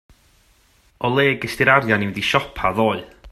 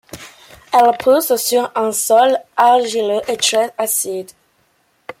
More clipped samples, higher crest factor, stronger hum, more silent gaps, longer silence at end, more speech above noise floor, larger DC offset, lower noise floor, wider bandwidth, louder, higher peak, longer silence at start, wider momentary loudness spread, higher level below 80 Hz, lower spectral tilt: neither; about the same, 20 dB vs 16 dB; neither; neither; about the same, 0 s vs 0.1 s; second, 38 dB vs 45 dB; neither; about the same, -57 dBFS vs -60 dBFS; second, 14 kHz vs 16.5 kHz; second, -19 LUFS vs -15 LUFS; about the same, 0 dBFS vs -2 dBFS; first, 1 s vs 0.15 s; about the same, 7 LU vs 7 LU; first, -48 dBFS vs -60 dBFS; first, -5.5 dB/octave vs -1.5 dB/octave